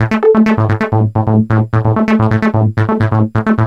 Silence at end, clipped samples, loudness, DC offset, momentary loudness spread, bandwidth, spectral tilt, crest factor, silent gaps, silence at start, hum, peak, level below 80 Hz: 0 s; under 0.1%; -12 LUFS; under 0.1%; 3 LU; 6.6 kHz; -9.5 dB/octave; 10 dB; none; 0 s; none; 0 dBFS; -38 dBFS